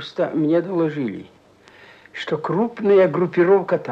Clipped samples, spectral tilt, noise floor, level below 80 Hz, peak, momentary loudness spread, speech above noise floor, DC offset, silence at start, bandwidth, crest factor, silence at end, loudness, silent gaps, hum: under 0.1%; -8 dB/octave; -49 dBFS; -66 dBFS; -4 dBFS; 13 LU; 30 dB; under 0.1%; 0 s; 7.4 kHz; 16 dB; 0 s; -19 LUFS; none; none